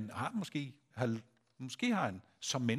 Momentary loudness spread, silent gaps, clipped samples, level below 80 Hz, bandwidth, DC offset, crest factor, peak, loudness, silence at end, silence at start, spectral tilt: 12 LU; none; under 0.1%; -78 dBFS; 15 kHz; under 0.1%; 20 dB; -20 dBFS; -38 LUFS; 0 s; 0 s; -4.5 dB/octave